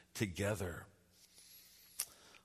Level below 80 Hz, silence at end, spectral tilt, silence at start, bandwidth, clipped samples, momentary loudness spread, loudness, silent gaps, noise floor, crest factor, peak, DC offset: -66 dBFS; 0.1 s; -4.5 dB/octave; 0.15 s; 13.5 kHz; under 0.1%; 22 LU; -42 LUFS; none; -66 dBFS; 26 dB; -18 dBFS; under 0.1%